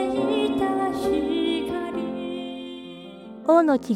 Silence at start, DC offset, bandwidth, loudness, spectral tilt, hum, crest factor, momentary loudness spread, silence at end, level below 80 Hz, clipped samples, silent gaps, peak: 0 s; under 0.1%; 13.5 kHz; -24 LUFS; -5.5 dB/octave; none; 16 dB; 19 LU; 0 s; -54 dBFS; under 0.1%; none; -8 dBFS